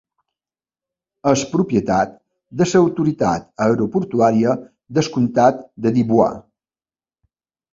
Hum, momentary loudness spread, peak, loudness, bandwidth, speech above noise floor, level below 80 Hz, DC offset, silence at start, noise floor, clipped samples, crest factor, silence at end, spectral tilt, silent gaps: none; 8 LU; -2 dBFS; -18 LUFS; 7.8 kHz; over 73 dB; -52 dBFS; under 0.1%; 1.25 s; under -90 dBFS; under 0.1%; 18 dB; 1.35 s; -6.5 dB/octave; none